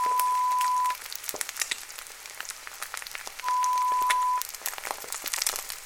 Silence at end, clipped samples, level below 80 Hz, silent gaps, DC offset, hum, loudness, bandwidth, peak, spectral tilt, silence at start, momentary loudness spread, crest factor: 0 s; under 0.1%; -64 dBFS; none; under 0.1%; none; -28 LUFS; 18 kHz; -4 dBFS; 2 dB/octave; 0 s; 12 LU; 26 dB